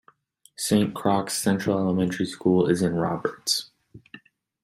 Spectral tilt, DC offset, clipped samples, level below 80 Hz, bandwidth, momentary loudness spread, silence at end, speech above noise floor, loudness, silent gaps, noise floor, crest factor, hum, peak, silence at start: -5 dB/octave; under 0.1%; under 0.1%; -60 dBFS; 16 kHz; 5 LU; 0.45 s; 35 dB; -24 LUFS; none; -58 dBFS; 18 dB; none; -8 dBFS; 0.6 s